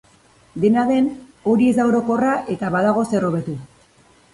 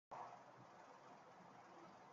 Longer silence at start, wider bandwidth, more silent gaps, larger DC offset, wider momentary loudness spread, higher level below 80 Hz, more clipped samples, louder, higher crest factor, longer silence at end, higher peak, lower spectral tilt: first, 0.55 s vs 0.1 s; first, 11.5 kHz vs 7.4 kHz; neither; neither; first, 10 LU vs 7 LU; first, -56 dBFS vs under -90 dBFS; neither; first, -19 LUFS vs -61 LUFS; about the same, 14 dB vs 18 dB; first, 0.7 s vs 0 s; first, -6 dBFS vs -42 dBFS; first, -7.5 dB/octave vs -3.5 dB/octave